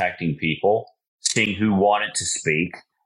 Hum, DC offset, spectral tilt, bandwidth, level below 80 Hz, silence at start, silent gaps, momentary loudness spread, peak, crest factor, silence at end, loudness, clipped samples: none; under 0.1%; -3.5 dB/octave; 12 kHz; -56 dBFS; 0 s; 1.08-1.18 s; 6 LU; -6 dBFS; 16 dB; 0.25 s; -21 LUFS; under 0.1%